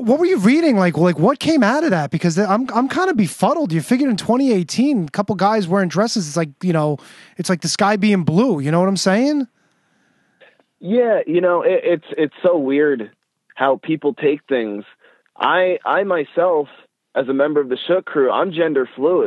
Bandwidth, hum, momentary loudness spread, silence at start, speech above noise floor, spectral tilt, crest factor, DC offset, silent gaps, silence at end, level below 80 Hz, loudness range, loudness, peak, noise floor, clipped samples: 12.5 kHz; none; 7 LU; 0 s; 44 dB; -6 dB/octave; 16 dB; under 0.1%; none; 0 s; -64 dBFS; 3 LU; -17 LUFS; -2 dBFS; -61 dBFS; under 0.1%